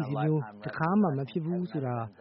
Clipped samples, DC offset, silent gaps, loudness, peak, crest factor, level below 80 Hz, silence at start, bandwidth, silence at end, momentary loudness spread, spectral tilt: under 0.1%; under 0.1%; none; -30 LUFS; -14 dBFS; 16 dB; -68 dBFS; 0 s; 5.8 kHz; 0.1 s; 7 LU; -8 dB/octave